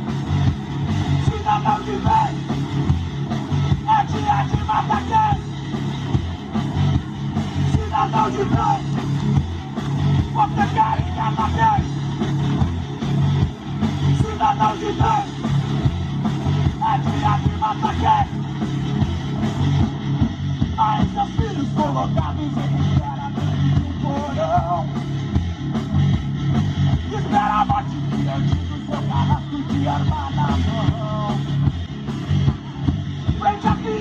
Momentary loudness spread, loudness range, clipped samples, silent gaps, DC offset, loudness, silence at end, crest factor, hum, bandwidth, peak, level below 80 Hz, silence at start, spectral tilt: 6 LU; 2 LU; under 0.1%; none; under 0.1%; -21 LUFS; 0 s; 16 dB; none; 7.8 kHz; -4 dBFS; -36 dBFS; 0 s; -7.5 dB/octave